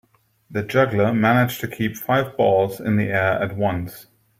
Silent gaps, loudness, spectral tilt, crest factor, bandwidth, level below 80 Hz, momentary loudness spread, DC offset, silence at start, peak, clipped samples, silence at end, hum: none; -20 LUFS; -6.5 dB/octave; 18 dB; 16 kHz; -54 dBFS; 9 LU; under 0.1%; 0.5 s; -4 dBFS; under 0.1%; 0.35 s; none